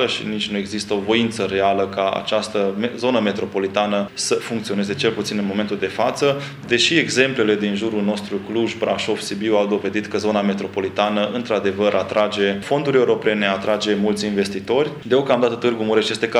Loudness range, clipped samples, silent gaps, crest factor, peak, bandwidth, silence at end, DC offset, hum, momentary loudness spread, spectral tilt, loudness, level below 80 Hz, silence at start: 2 LU; under 0.1%; none; 20 dB; 0 dBFS; 13 kHz; 0 s; under 0.1%; none; 6 LU; -4.5 dB/octave; -20 LUFS; -58 dBFS; 0 s